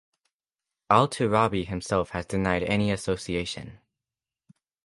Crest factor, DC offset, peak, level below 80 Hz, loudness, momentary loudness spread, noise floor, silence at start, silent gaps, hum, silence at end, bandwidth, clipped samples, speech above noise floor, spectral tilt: 24 dB; under 0.1%; -4 dBFS; -48 dBFS; -26 LUFS; 8 LU; under -90 dBFS; 0.9 s; none; none; 1.1 s; 11.5 kHz; under 0.1%; over 65 dB; -5.5 dB/octave